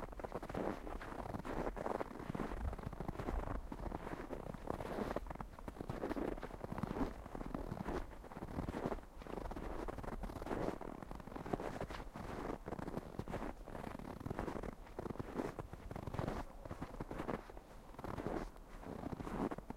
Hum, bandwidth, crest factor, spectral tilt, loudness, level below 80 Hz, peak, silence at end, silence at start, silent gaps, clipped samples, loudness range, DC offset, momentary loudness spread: none; 16 kHz; 24 dB; -7 dB/octave; -46 LUFS; -52 dBFS; -20 dBFS; 0 s; 0 s; none; under 0.1%; 2 LU; under 0.1%; 7 LU